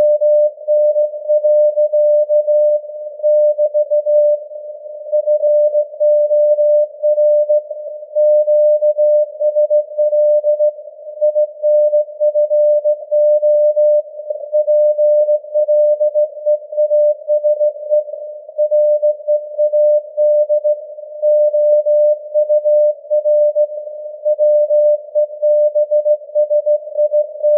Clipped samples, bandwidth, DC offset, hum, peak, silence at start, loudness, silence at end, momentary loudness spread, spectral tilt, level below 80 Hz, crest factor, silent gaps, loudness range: under 0.1%; 0.8 kHz; under 0.1%; none; -4 dBFS; 0 s; -14 LUFS; 0 s; 7 LU; -9 dB/octave; under -90 dBFS; 10 dB; none; 2 LU